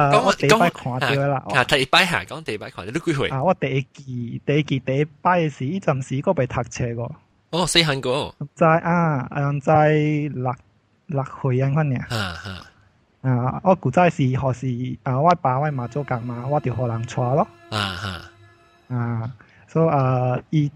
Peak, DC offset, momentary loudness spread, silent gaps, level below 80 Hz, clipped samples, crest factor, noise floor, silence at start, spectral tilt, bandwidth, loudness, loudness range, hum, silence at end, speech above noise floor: 0 dBFS; under 0.1%; 12 LU; none; -50 dBFS; under 0.1%; 20 dB; -58 dBFS; 0 s; -5.5 dB/octave; 14.5 kHz; -21 LUFS; 6 LU; none; 0.05 s; 37 dB